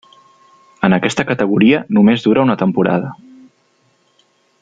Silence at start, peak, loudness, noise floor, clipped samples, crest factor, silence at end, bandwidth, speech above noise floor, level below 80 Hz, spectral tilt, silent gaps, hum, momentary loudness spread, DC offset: 0.8 s; -2 dBFS; -14 LUFS; -58 dBFS; under 0.1%; 14 dB; 1.45 s; 9.2 kHz; 45 dB; -54 dBFS; -6.5 dB/octave; none; none; 6 LU; under 0.1%